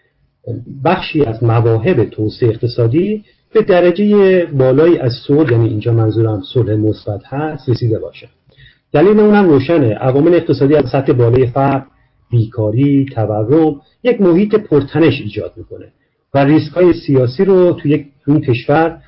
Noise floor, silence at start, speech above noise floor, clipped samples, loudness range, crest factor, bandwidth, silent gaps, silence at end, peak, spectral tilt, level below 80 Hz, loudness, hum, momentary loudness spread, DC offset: -46 dBFS; 0.45 s; 34 dB; under 0.1%; 3 LU; 12 dB; 5.8 kHz; none; 0.1 s; -2 dBFS; -13 dB/octave; -42 dBFS; -13 LUFS; none; 9 LU; under 0.1%